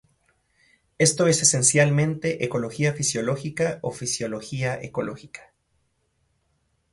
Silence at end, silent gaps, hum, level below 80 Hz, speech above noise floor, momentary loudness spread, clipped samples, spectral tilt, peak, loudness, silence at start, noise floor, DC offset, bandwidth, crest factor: 1.5 s; none; none; -60 dBFS; 47 dB; 13 LU; under 0.1%; -4 dB/octave; -4 dBFS; -22 LUFS; 1 s; -70 dBFS; under 0.1%; 11.5 kHz; 22 dB